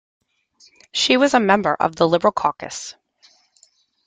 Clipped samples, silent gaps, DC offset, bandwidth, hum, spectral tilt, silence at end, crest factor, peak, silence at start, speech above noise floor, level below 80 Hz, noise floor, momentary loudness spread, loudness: under 0.1%; none; under 0.1%; 9.6 kHz; none; -3.5 dB/octave; 1.15 s; 20 dB; -2 dBFS; 0.95 s; 40 dB; -60 dBFS; -58 dBFS; 15 LU; -18 LUFS